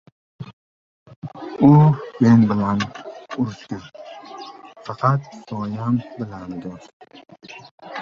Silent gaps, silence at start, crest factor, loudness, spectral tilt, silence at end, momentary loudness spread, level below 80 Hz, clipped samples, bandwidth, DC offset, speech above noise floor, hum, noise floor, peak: 0.53-1.06 s, 1.16-1.22 s, 6.93-7.00 s, 7.71-7.78 s; 0.4 s; 20 dB; -18 LUFS; -8.5 dB/octave; 0 s; 26 LU; -54 dBFS; under 0.1%; 7.2 kHz; under 0.1%; 20 dB; none; -39 dBFS; 0 dBFS